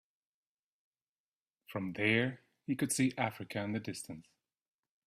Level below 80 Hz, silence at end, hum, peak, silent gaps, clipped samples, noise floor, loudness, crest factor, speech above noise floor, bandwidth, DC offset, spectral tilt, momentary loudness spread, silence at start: -74 dBFS; 0.85 s; none; -16 dBFS; none; under 0.1%; under -90 dBFS; -35 LUFS; 24 dB; over 55 dB; 15.5 kHz; under 0.1%; -4.5 dB/octave; 15 LU; 1.7 s